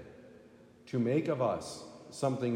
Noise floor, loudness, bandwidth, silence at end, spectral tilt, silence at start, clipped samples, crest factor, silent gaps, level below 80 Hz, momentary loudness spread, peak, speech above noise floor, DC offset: -58 dBFS; -33 LUFS; 15.5 kHz; 0 s; -6.5 dB/octave; 0 s; under 0.1%; 16 dB; none; -72 dBFS; 18 LU; -18 dBFS; 26 dB; under 0.1%